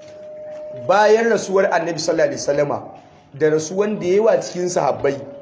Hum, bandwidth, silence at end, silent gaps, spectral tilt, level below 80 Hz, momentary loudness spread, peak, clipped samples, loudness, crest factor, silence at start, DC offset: none; 8 kHz; 0 s; none; -4.5 dB/octave; -58 dBFS; 15 LU; -4 dBFS; under 0.1%; -18 LUFS; 16 dB; 0 s; under 0.1%